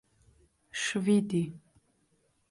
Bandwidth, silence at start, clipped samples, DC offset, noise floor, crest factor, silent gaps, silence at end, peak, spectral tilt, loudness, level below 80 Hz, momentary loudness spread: 11.5 kHz; 0.75 s; under 0.1%; under 0.1%; -72 dBFS; 18 dB; none; 0.9 s; -16 dBFS; -5 dB/octave; -30 LUFS; -68 dBFS; 12 LU